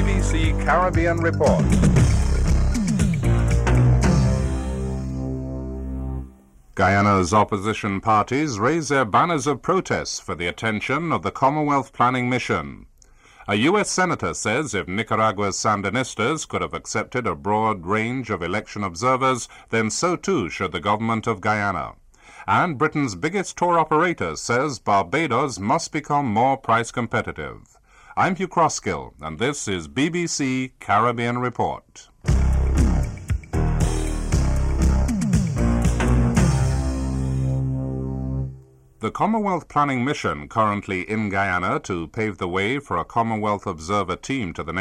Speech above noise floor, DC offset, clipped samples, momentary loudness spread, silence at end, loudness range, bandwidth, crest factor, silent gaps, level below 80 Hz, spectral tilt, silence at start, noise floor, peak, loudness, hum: 29 dB; under 0.1%; under 0.1%; 9 LU; 0 s; 4 LU; 12 kHz; 16 dB; none; -28 dBFS; -5.5 dB/octave; 0 s; -51 dBFS; -6 dBFS; -22 LUFS; none